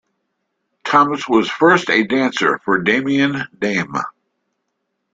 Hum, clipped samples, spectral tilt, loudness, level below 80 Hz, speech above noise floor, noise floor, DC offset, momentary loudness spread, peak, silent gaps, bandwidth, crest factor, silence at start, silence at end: none; under 0.1%; -5 dB/octave; -16 LUFS; -60 dBFS; 57 dB; -73 dBFS; under 0.1%; 9 LU; 0 dBFS; none; 7.8 kHz; 18 dB; 0.85 s; 1.05 s